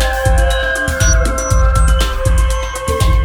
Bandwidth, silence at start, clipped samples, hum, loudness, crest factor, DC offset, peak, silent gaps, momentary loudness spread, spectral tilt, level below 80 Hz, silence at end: 16 kHz; 0 s; under 0.1%; none; -14 LUFS; 12 dB; under 0.1%; 0 dBFS; none; 3 LU; -4 dB/octave; -14 dBFS; 0 s